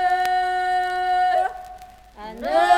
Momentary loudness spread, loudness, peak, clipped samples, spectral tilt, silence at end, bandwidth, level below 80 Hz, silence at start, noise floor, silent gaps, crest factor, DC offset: 20 LU; -22 LUFS; -4 dBFS; under 0.1%; -2.5 dB/octave; 0 s; 15.5 kHz; -52 dBFS; 0 s; -43 dBFS; none; 16 dB; under 0.1%